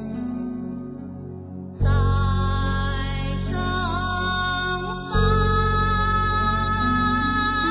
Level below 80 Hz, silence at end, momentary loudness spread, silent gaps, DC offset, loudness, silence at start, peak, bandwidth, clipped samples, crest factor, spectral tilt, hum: -28 dBFS; 0 s; 13 LU; none; under 0.1%; -23 LUFS; 0 s; -8 dBFS; 4 kHz; under 0.1%; 14 dB; -10 dB/octave; none